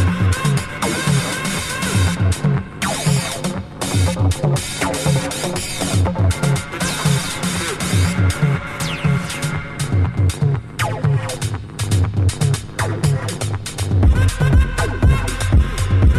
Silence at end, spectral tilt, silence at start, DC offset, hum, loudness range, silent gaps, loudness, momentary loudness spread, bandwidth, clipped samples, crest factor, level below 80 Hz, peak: 0 s; -5 dB/octave; 0 s; under 0.1%; none; 2 LU; none; -19 LUFS; 6 LU; 14 kHz; under 0.1%; 14 dB; -24 dBFS; -2 dBFS